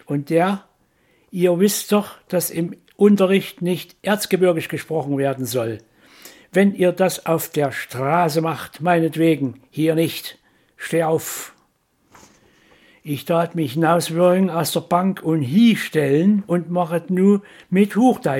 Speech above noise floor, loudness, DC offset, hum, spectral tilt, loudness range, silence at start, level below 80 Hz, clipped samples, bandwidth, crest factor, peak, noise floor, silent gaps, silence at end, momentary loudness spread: 45 dB; -19 LUFS; under 0.1%; none; -6 dB/octave; 6 LU; 0.1 s; -66 dBFS; under 0.1%; 17 kHz; 16 dB; -2 dBFS; -63 dBFS; none; 0 s; 10 LU